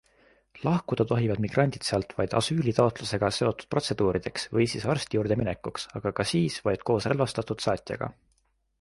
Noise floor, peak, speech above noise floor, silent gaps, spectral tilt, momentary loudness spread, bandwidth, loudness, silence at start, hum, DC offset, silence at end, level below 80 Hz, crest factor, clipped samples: -63 dBFS; -8 dBFS; 36 dB; none; -5.5 dB/octave; 6 LU; 11.5 kHz; -28 LUFS; 0.55 s; none; under 0.1%; 0.7 s; -52 dBFS; 20 dB; under 0.1%